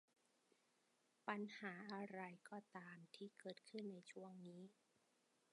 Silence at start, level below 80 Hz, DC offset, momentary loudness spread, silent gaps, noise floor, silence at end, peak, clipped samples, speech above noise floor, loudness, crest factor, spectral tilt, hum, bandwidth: 1.25 s; under -90 dBFS; under 0.1%; 10 LU; none; -83 dBFS; 0.8 s; -30 dBFS; under 0.1%; 29 dB; -55 LUFS; 26 dB; -5.5 dB/octave; none; 11 kHz